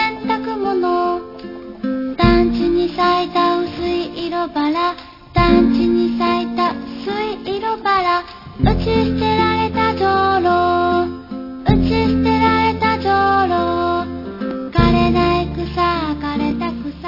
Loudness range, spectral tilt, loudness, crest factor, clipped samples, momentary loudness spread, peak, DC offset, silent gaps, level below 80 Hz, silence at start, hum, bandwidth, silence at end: 2 LU; -8 dB/octave; -17 LUFS; 16 dB; under 0.1%; 10 LU; 0 dBFS; under 0.1%; none; -32 dBFS; 0 s; none; 5.8 kHz; 0 s